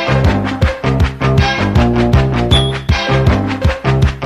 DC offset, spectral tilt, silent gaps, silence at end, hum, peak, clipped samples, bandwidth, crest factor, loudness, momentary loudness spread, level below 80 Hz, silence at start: under 0.1%; -6.5 dB/octave; none; 0 s; none; 0 dBFS; under 0.1%; 11 kHz; 12 dB; -13 LUFS; 3 LU; -20 dBFS; 0 s